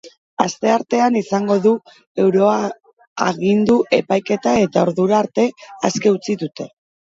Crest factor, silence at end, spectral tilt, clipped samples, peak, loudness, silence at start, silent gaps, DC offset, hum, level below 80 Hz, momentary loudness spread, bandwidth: 18 dB; 0.45 s; -5.5 dB/octave; under 0.1%; 0 dBFS; -17 LUFS; 0.05 s; 0.18-0.37 s, 2.07-2.15 s, 2.93-2.97 s, 3.07-3.16 s; under 0.1%; none; -58 dBFS; 10 LU; 7.8 kHz